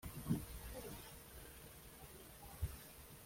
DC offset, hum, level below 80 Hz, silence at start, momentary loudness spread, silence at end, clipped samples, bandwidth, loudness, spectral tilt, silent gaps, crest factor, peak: under 0.1%; none; -56 dBFS; 0 s; 13 LU; 0 s; under 0.1%; 16.5 kHz; -50 LUFS; -5.5 dB/octave; none; 24 dB; -26 dBFS